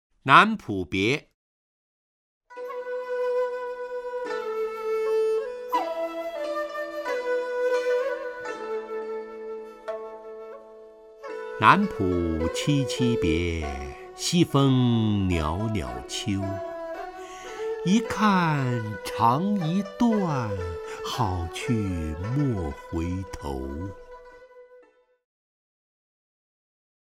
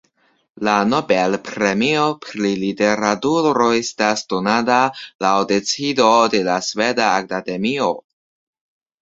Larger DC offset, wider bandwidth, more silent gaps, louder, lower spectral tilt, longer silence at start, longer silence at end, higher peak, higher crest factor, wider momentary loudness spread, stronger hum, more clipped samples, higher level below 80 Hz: neither; first, 16 kHz vs 7.8 kHz; first, 1.34-2.41 s vs 5.15-5.19 s; second, -26 LUFS vs -18 LUFS; first, -6 dB/octave vs -4 dB/octave; second, 0.25 s vs 0.6 s; first, 2.2 s vs 1 s; about the same, -2 dBFS vs -2 dBFS; first, 26 dB vs 18 dB; first, 16 LU vs 6 LU; neither; neither; first, -46 dBFS vs -58 dBFS